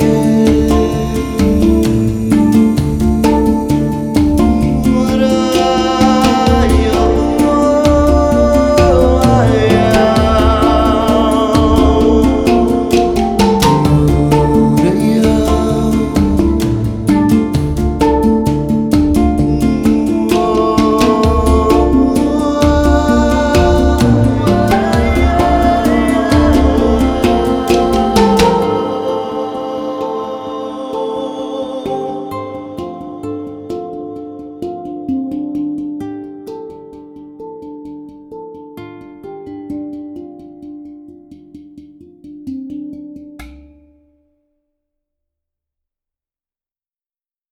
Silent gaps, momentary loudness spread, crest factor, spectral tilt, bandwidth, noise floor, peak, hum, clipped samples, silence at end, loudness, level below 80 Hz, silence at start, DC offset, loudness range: none; 18 LU; 12 dB; -6.5 dB/octave; 17 kHz; under -90 dBFS; 0 dBFS; none; under 0.1%; 3.95 s; -12 LUFS; -22 dBFS; 0 s; under 0.1%; 20 LU